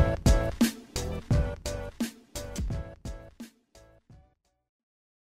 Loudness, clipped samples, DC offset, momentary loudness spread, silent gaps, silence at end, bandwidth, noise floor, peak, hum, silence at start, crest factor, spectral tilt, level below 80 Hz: -31 LUFS; under 0.1%; under 0.1%; 19 LU; none; 1.85 s; 16 kHz; -65 dBFS; -12 dBFS; none; 0 s; 20 dB; -5.5 dB/octave; -34 dBFS